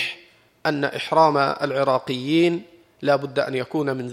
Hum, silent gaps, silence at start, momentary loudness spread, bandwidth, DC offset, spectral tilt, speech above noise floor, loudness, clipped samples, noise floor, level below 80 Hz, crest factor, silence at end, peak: none; none; 0 s; 10 LU; 14.5 kHz; under 0.1%; -6 dB/octave; 30 dB; -22 LUFS; under 0.1%; -51 dBFS; -68 dBFS; 20 dB; 0 s; -4 dBFS